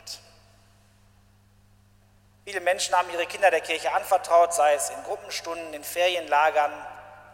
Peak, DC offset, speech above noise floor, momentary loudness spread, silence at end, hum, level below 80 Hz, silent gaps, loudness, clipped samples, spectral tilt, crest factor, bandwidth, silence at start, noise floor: -8 dBFS; under 0.1%; 34 dB; 19 LU; 0.1 s; none; -64 dBFS; none; -24 LUFS; under 0.1%; -1 dB/octave; 20 dB; 16.5 kHz; 0.05 s; -58 dBFS